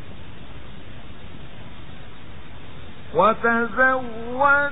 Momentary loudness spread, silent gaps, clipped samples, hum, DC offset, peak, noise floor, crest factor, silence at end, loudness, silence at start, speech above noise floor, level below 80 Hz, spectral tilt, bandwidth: 24 LU; none; under 0.1%; none; 3%; -4 dBFS; -42 dBFS; 20 dB; 0 s; -20 LUFS; 0 s; 22 dB; -48 dBFS; -9 dB/octave; 4 kHz